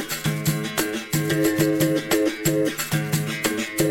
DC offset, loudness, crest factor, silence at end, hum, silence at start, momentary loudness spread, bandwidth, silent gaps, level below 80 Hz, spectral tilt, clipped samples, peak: under 0.1%; -23 LUFS; 16 dB; 0 s; none; 0 s; 4 LU; 17.5 kHz; none; -52 dBFS; -4.5 dB/octave; under 0.1%; -6 dBFS